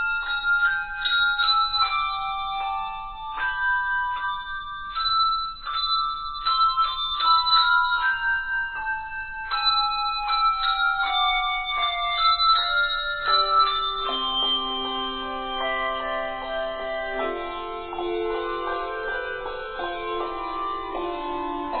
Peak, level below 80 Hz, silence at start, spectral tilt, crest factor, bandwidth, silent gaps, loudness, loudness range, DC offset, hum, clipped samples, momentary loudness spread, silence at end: -8 dBFS; -46 dBFS; 0 s; -5.5 dB/octave; 16 dB; 4.7 kHz; none; -23 LUFS; 8 LU; under 0.1%; none; under 0.1%; 11 LU; 0 s